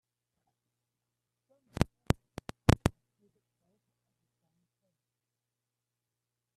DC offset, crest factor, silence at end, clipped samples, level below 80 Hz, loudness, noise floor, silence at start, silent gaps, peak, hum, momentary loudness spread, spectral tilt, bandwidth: under 0.1%; 34 dB; 3.65 s; under 0.1%; -48 dBFS; -32 LUFS; -89 dBFS; 1.8 s; none; -4 dBFS; none; 14 LU; -6 dB/octave; 13.5 kHz